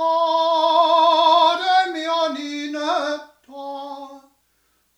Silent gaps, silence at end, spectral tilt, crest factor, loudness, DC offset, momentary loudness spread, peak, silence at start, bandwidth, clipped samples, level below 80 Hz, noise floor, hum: none; 0.8 s; -0.5 dB/octave; 16 dB; -18 LUFS; under 0.1%; 18 LU; -4 dBFS; 0 s; 11.5 kHz; under 0.1%; -76 dBFS; -65 dBFS; 60 Hz at -75 dBFS